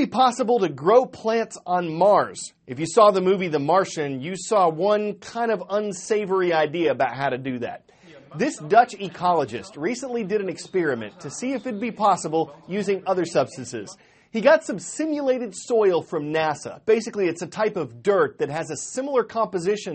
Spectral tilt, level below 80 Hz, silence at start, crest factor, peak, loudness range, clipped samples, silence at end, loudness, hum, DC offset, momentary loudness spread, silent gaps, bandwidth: -5 dB/octave; -68 dBFS; 0 s; 20 dB; -4 dBFS; 5 LU; under 0.1%; 0 s; -23 LUFS; none; under 0.1%; 11 LU; none; 8.8 kHz